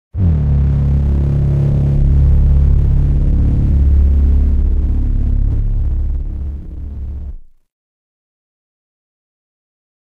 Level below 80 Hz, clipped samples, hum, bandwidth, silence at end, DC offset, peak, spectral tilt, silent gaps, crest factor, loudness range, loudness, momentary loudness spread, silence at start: -14 dBFS; under 0.1%; none; 2.7 kHz; 2.65 s; 0.6%; -2 dBFS; -11 dB/octave; none; 10 dB; 17 LU; -15 LUFS; 14 LU; 0.15 s